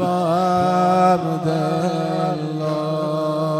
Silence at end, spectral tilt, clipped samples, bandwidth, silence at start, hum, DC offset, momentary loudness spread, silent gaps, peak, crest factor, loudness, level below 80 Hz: 0 s; -7 dB/octave; under 0.1%; 14.5 kHz; 0 s; none; under 0.1%; 7 LU; none; -6 dBFS; 14 dB; -19 LUFS; -62 dBFS